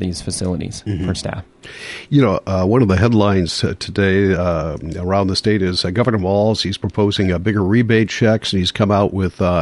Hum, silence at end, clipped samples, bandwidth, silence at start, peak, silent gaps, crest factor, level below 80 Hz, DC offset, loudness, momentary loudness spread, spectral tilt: none; 0 s; under 0.1%; 11.5 kHz; 0 s; -2 dBFS; none; 16 dB; -34 dBFS; under 0.1%; -17 LUFS; 10 LU; -6 dB/octave